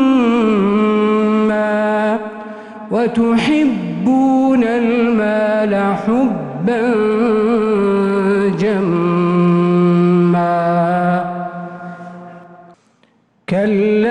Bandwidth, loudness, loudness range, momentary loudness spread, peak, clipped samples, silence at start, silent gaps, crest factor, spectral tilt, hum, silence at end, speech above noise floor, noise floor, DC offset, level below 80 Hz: 10 kHz; -15 LUFS; 4 LU; 13 LU; -4 dBFS; under 0.1%; 0 s; none; 12 dB; -8 dB/octave; none; 0 s; 42 dB; -56 dBFS; under 0.1%; -52 dBFS